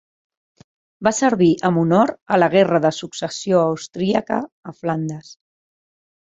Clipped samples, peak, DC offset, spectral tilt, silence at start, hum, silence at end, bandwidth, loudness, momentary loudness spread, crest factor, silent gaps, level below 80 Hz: under 0.1%; -2 dBFS; under 0.1%; -5.5 dB/octave; 1 s; none; 0.95 s; 8.2 kHz; -19 LUFS; 12 LU; 18 dB; 2.22-2.26 s, 4.52-4.63 s; -60 dBFS